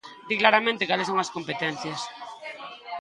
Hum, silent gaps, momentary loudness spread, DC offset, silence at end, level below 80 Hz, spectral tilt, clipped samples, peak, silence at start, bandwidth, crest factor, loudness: none; none; 18 LU; under 0.1%; 0 s; -72 dBFS; -3.5 dB/octave; under 0.1%; -2 dBFS; 0.05 s; 11.5 kHz; 26 dB; -24 LUFS